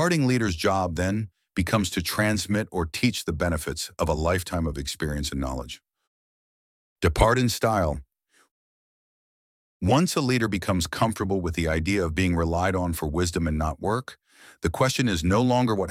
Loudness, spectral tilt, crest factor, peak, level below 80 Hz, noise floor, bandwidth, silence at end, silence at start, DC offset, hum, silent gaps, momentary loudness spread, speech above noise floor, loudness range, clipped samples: -25 LUFS; -5 dB/octave; 22 dB; -4 dBFS; -38 dBFS; under -90 dBFS; 16.5 kHz; 0 s; 0 s; under 0.1%; none; 6.07-6.96 s, 8.51-9.80 s; 8 LU; over 66 dB; 3 LU; under 0.1%